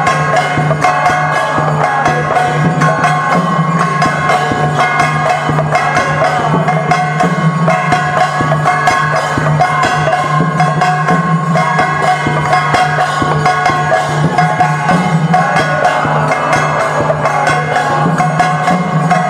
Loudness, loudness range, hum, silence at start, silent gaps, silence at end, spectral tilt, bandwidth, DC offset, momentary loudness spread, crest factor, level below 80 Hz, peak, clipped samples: -11 LUFS; 0 LU; none; 0 s; none; 0 s; -5.5 dB/octave; 12 kHz; under 0.1%; 2 LU; 10 dB; -42 dBFS; 0 dBFS; under 0.1%